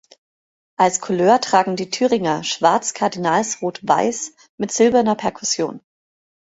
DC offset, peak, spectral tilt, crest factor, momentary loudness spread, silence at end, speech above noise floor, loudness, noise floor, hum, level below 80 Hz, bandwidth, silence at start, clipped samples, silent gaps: under 0.1%; -2 dBFS; -3.5 dB/octave; 18 dB; 9 LU; 0.8 s; over 72 dB; -18 LUFS; under -90 dBFS; none; -60 dBFS; 8.2 kHz; 0.8 s; under 0.1%; 4.49-4.58 s